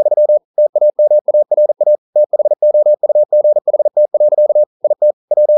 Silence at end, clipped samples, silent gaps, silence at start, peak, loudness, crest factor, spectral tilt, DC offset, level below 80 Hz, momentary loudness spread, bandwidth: 0 s; under 0.1%; 0.45-0.54 s, 0.69-0.73 s, 1.21-1.25 s, 1.98-2.13 s, 4.66-4.80 s, 5.13-5.28 s; 0 s; -4 dBFS; -12 LUFS; 6 dB; -11.5 dB/octave; under 0.1%; -80 dBFS; 3 LU; 1.1 kHz